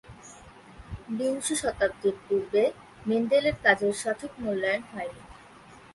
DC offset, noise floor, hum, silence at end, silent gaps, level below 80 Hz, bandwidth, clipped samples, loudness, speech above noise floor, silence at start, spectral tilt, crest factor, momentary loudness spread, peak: under 0.1%; -51 dBFS; none; 0.15 s; none; -54 dBFS; 11.5 kHz; under 0.1%; -27 LUFS; 24 dB; 0.05 s; -3.5 dB/octave; 24 dB; 21 LU; -6 dBFS